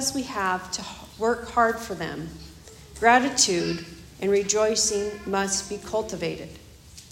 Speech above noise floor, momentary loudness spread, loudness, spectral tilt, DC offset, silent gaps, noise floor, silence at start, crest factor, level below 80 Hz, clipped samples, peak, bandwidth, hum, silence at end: 22 dB; 19 LU; -24 LUFS; -2.5 dB/octave; under 0.1%; none; -47 dBFS; 0 s; 22 dB; -52 dBFS; under 0.1%; -4 dBFS; 16 kHz; none; 0.05 s